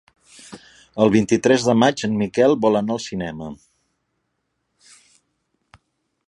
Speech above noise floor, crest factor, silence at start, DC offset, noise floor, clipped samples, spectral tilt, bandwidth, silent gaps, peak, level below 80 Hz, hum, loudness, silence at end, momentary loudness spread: 56 dB; 20 dB; 0.5 s; under 0.1%; -74 dBFS; under 0.1%; -5.5 dB/octave; 11 kHz; none; -2 dBFS; -56 dBFS; none; -18 LUFS; 2.75 s; 19 LU